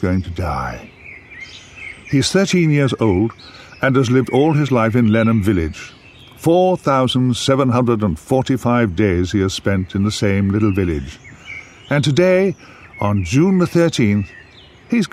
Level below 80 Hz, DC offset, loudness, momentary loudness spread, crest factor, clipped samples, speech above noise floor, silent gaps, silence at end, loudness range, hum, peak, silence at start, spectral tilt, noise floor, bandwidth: -40 dBFS; under 0.1%; -16 LUFS; 19 LU; 14 dB; under 0.1%; 28 dB; none; 0.05 s; 3 LU; none; -2 dBFS; 0 s; -6.5 dB/octave; -43 dBFS; 15 kHz